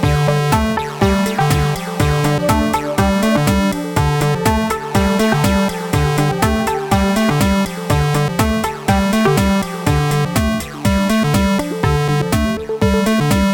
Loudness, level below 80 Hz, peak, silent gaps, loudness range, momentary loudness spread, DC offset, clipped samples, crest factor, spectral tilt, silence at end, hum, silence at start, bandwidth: -16 LUFS; -26 dBFS; -2 dBFS; none; 1 LU; 4 LU; under 0.1%; under 0.1%; 14 dB; -5.5 dB/octave; 0 s; none; 0 s; over 20 kHz